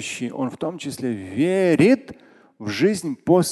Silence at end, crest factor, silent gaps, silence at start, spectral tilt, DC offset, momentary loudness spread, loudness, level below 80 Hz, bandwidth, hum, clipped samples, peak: 0 s; 18 dB; none; 0 s; -5.5 dB/octave; under 0.1%; 12 LU; -21 LUFS; -58 dBFS; 12.5 kHz; none; under 0.1%; -4 dBFS